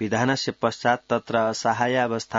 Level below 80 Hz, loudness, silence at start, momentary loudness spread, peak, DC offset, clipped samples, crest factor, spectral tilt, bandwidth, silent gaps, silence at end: -64 dBFS; -23 LUFS; 0 s; 2 LU; -6 dBFS; under 0.1%; under 0.1%; 18 dB; -4.5 dB/octave; 7.8 kHz; none; 0 s